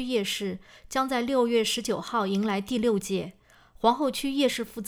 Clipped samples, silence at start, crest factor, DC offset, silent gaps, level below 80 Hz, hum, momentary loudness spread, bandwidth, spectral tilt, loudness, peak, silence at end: under 0.1%; 0 s; 18 dB; under 0.1%; none; -58 dBFS; none; 8 LU; over 20 kHz; -4 dB/octave; -27 LUFS; -10 dBFS; 0 s